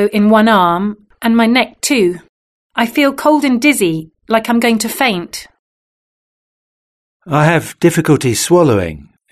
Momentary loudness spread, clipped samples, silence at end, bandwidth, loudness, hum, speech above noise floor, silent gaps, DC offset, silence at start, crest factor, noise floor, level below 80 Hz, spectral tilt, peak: 11 LU; under 0.1%; 0.3 s; 14 kHz; -13 LUFS; none; over 78 dB; 2.29-2.70 s, 5.59-7.20 s; under 0.1%; 0 s; 14 dB; under -90 dBFS; -48 dBFS; -5 dB/octave; 0 dBFS